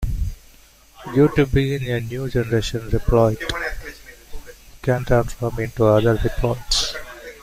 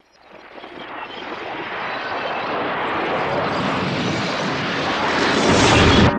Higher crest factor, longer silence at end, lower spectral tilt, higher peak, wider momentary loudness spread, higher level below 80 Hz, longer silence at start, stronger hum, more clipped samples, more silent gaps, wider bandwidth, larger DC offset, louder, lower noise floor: about the same, 18 dB vs 18 dB; about the same, 0.05 s vs 0 s; about the same, -5.5 dB/octave vs -4.5 dB/octave; about the same, -4 dBFS vs -2 dBFS; second, 14 LU vs 18 LU; first, -30 dBFS vs -36 dBFS; second, 0 s vs 0.35 s; neither; neither; neither; first, 16 kHz vs 10.5 kHz; neither; about the same, -21 LUFS vs -19 LUFS; first, -49 dBFS vs -45 dBFS